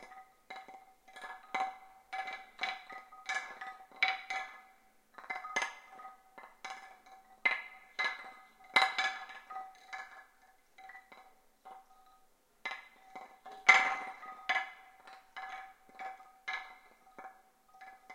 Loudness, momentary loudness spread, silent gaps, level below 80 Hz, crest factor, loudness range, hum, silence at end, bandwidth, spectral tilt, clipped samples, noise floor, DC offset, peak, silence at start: -35 LUFS; 25 LU; none; -78 dBFS; 32 dB; 17 LU; none; 0 s; 16.5 kHz; 0.5 dB/octave; under 0.1%; -68 dBFS; under 0.1%; -6 dBFS; 0 s